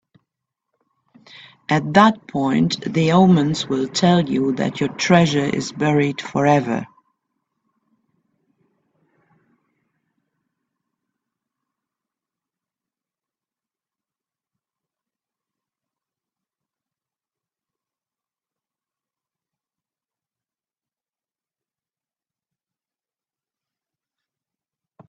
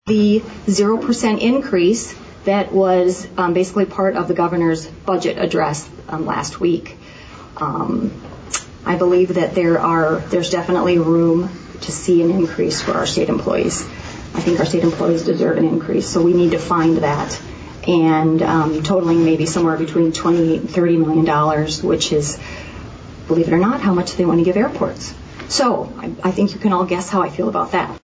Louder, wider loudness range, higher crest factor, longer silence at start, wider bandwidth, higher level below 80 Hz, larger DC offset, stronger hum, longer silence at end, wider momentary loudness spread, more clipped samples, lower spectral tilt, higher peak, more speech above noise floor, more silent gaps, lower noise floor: about the same, -18 LUFS vs -17 LUFS; first, 8 LU vs 4 LU; first, 24 dB vs 12 dB; first, 1.7 s vs 0.05 s; about the same, 8 kHz vs 8 kHz; second, -62 dBFS vs -42 dBFS; neither; neither; first, 18.25 s vs 0.05 s; about the same, 9 LU vs 11 LU; neither; about the same, -6 dB/octave vs -5.5 dB/octave; first, 0 dBFS vs -6 dBFS; first, over 73 dB vs 21 dB; neither; first, under -90 dBFS vs -37 dBFS